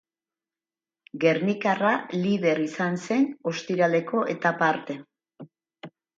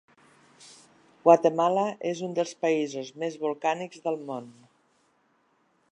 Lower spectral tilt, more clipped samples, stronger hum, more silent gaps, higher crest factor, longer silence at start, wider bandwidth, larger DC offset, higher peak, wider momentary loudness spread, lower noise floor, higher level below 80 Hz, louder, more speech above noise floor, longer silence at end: about the same, -6 dB/octave vs -5.5 dB/octave; neither; neither; neither; about the same, 20 dB vs 24 dB; first, 1.15 s vs 0.65 s; second, 7.8 kHz vs 10.5 kHz; neither; second, -8 dBFS vs -4 dBFS; second, 8 LU vs 14 LU; first, under -90 dBFS vs -68 dBFS; first, -74 dBFS vs -84 dBFS; about the same, -25 LUFS vs -26 LUFS; first, over 66 dB vs 42 dB; second, 0.3 s vs 1.4 s